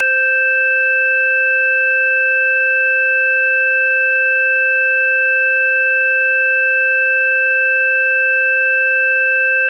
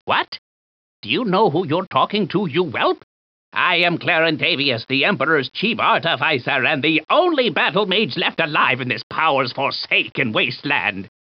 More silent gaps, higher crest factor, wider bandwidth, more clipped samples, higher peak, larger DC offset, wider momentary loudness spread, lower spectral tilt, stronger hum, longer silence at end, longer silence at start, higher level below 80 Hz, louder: second, none vs 0.28-0.32 s, 0.38-1.03 s, 1.87-1.91 s, 3.03-3.52 s, 9.03-9.10 s; second, 8 dB vs 16 dB; second, 5.6 kHz vs 6.4 kHz; neither; second, -6 dBFS vs -2 dBFS; neither; second, 0 LU vs 5 LU; second, 0.5 dB/octave vs -2 dB/octave; neither; second, 0 s vs 0.2 s; about the same, 0 s vs 0.05 s; second, under -90 dBFS vs -68 dBFS; first, -12 LUFS vs -18 LUFS